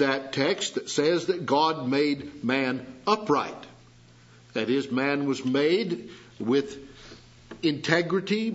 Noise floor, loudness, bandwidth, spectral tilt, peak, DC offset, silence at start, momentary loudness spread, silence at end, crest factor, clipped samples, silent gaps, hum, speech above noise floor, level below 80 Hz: -53 dBFS; -26 LUFS; 8 kHz; -4.5 dB/octave; -6 dBFS; under 0.1%; 0 s; 11 LU; 0 s; 22 dB; under 0.1%; none; none; 28 dB; -64 dBFS